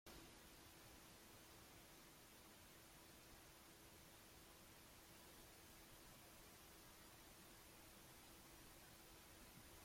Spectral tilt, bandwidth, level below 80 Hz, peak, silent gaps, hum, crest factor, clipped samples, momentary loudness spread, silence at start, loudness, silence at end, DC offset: -2.5 dB/octave; 16.5 kHz; -74 dBFS; -48 dBFS; none; none; 16 dB; under 0.1%; 1 LU; 0.05 s; -63 LUFS; 0 s; under 0.1%